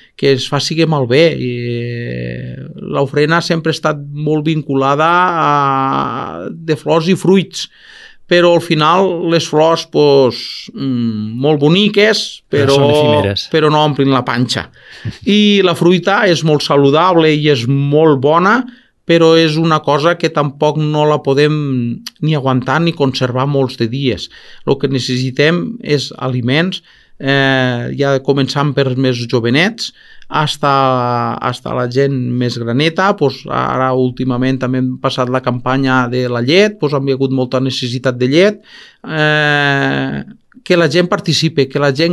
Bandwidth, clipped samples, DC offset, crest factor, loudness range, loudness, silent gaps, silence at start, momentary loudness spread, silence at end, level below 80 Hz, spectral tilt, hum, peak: 12.5 kHz; under 0.1%; under 0.1%; 12 dB; 4 LU; -13 LUFS; none; 0.2 s; 10 LU; 0 s; -50 dBFS; -6 dB/octave; none; 0 dBFS